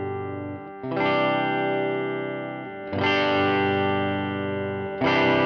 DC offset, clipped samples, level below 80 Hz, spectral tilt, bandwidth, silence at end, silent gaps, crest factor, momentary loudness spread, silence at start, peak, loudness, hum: under 0.1%; under 0.1%; -62 dBFS; -7 dB/octave; 6.6 kHz; 0 s; none; 14 dB; 12 LU; 0 s; -10 dBFS; -24 LUFS; 50 Hz at -55 dBFS